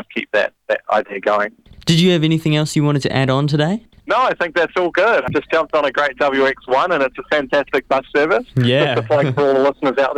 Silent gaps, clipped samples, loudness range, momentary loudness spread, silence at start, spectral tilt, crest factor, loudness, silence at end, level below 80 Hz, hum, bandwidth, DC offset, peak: none; under 0.1%; 1 LU; 5 LU; 0.1 s; -6 dB/octave; 16 dB; -17 LUFS; 0 s; -50 dBFS; none; 13.5 kHz; under 0.1%; 0 dBFS